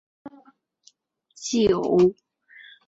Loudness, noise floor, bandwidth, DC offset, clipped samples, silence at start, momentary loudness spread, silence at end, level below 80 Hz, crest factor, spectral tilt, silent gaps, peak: -22 LUFS; -61 dBFS; 8 kHz; under 0.1%; under 0.1%; 0.25 s; 9 LU; 0.75 s; -56 dBFS; 18 dB; -5.5 dB/octave; none; -8 dBFS